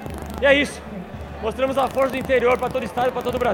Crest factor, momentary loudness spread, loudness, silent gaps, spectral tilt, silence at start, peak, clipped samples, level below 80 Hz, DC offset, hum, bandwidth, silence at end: 20 dB; 16 LU; -21 LUFS; none; -5 dB/octave; 0 s; -2 dBFS; under 0.1%; -40 dBFS; under 0.1%; none; 17 kHz; 0 s